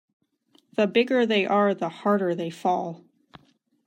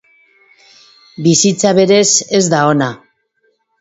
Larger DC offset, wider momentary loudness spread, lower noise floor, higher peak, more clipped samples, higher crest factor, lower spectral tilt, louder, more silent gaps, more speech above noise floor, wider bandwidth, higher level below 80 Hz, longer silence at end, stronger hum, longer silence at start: neither; first, 10 LU vs 7 LU; about the same, -64 dBFS vs -62 dBFS; second, -10 dBFS vs 0 dBFS; neither; about the same, 16 dB vs 14 dB; first, -6 dB/octave vs -3.5 dB/octave; second, -24 LUFS vs -11 LUFS; neither; second, 41 dB vs 50 dB; first, 11.5 kHz vs 8 kHz; second, -78 dBFS vs -56 dBFS; about the same, 0.9 s vs 0.85 s; neither; second, 0.8 s vs 1.2 s